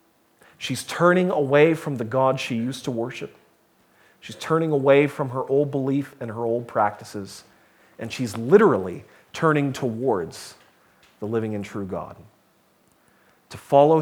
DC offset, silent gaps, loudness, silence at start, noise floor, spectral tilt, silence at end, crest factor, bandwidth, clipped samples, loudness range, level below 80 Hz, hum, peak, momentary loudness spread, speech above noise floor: under 0.1%; none; -22 LUFS; 0.6 s; -61 dBFS; -6.5 dB/octave; 0 s; 20 dB; 17 kHz; under 0.1%; 7 LU; -66 dBFS; none; -2 dBFS; 21 LU; 40 dB